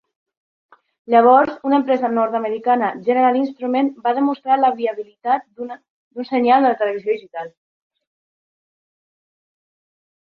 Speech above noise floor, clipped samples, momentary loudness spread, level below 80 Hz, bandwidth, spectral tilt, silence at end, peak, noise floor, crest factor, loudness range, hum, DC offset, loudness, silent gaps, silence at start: over 73 dB; under 0.1%; 18 LU; -68 dBFS; 5.2 kHz; -7.5 dB/octave; 2.75 s; -2 dBFS; under -90 dBFS; 18 dB; 5 LU; none; under 0.1%; -18 LUFS; 5.90-6.11 s; 1.1 s